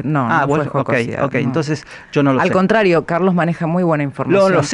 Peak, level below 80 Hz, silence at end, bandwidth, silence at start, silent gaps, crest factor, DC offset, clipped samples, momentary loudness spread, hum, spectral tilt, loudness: -4 dBFS; -50 dBFS; 0 s; 11 kHz; 0 s; none; 12 dB; under 0.1%; under 0.1%; 6 LU; none; -6.5 dB/octave; -16 LUFS